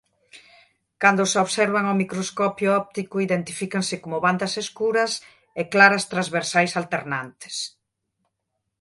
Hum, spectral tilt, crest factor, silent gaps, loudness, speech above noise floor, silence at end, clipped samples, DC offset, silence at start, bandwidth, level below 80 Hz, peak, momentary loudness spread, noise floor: none; -4 dB/octave; 22 dB; none; -22 LUFS; 56 dB; 1.15 s; under 0.1%; under 0.1%; 0.35 s; 11.5 kHz; -68 dBFS; 0 dBFS; 14 LU; -79 dBFS